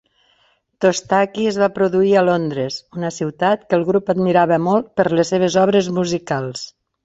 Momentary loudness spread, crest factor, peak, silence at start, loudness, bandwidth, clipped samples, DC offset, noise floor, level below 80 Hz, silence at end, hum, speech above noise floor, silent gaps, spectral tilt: 10 LU; 16 dB; -2 dBFS; 0.8 s; -17 LUFS; 8 kHz; under 0.1%; under 0.1%; -60 dBFS; -56 dBFS; 0.35 s; none; 43 dB; none; -5.5 dB/octave